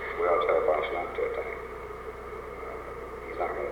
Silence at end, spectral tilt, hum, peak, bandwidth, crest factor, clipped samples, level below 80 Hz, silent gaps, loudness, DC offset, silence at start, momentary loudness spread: 0 s; -6 dB/octave; none; -12 dBFS; 19 kHz; 18 dB; under 0.1%; -50 dBFS; none; -31 LUFS; under 0.1%; 0 s; 14 LU